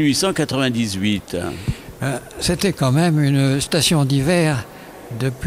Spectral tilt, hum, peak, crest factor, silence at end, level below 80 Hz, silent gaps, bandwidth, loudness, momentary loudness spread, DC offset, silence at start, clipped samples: -5 dB/octave; none; -6 dBFS; 14 dB; 0 s; -42 dBFS; none; 16 kHz; -19 LUFS; 10 LU; under 0.1%; 0 s; under 0.1%